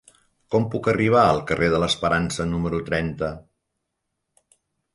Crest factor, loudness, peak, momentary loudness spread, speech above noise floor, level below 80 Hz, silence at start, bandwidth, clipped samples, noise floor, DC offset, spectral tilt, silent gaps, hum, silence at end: 18 dB; -22 LUFS; -6 dBFS; 10 LU; 58 dB; -44 dBFS; 0.5 s; 11.5 kHz; under 0.1%; -79 dBFS; under 0.1%; -5.5 dB/octave; none; none; 1.55 s